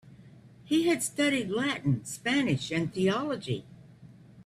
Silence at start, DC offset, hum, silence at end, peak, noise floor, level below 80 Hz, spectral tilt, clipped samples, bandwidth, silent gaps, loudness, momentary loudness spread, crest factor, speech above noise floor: 0.05 s; under 0.1%; none; 0.05 s; -16 dBFS; -53 dBFS; -64 dBFS; -5 dB/octave; under 0.1%; 14 kHz; none; -29 LUFS; 6 LU; 14 dB; 24 dB